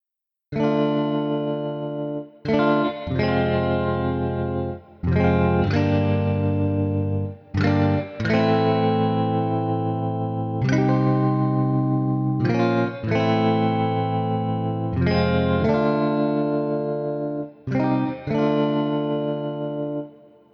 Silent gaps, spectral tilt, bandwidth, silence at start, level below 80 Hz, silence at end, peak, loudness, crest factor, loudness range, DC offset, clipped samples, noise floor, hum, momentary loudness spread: none; -9 dB/octave; 6.4 kHz; 0.5 s; -46 dBFS; 0.4 s; -6 dBFS; -22 LUFS; 16 dB; 2 LU; under 0.1%; under 0.1%; -85 dBFS; none; 8 LU